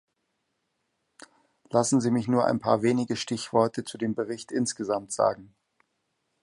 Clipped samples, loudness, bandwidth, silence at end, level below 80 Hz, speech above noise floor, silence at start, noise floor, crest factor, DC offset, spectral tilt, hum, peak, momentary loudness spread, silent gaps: under 0.1%; -26 LUFS; 11.5 kHz; 0.95 s; -66 dBFS; 52 dB; 1.7 s; -78 dBFS; 20 dB; under 0.1%; -5 dB/octave; none; -8 dBFS; 7 LU; none